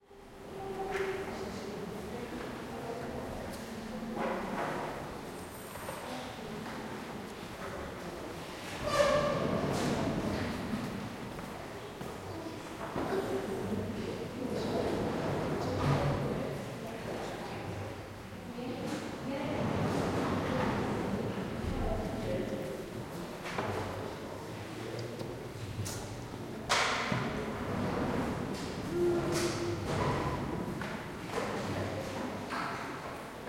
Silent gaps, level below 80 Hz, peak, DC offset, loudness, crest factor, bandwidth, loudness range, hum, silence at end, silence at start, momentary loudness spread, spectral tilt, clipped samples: none; -52 dBFS; -14 dBFS; under 0.1%; -36 LUFS; 22 dB; 16.5 kHz; 6 LU; none; 0 s; 0.1 s; 11 LU; -5.5 dB/octave; under 0.1%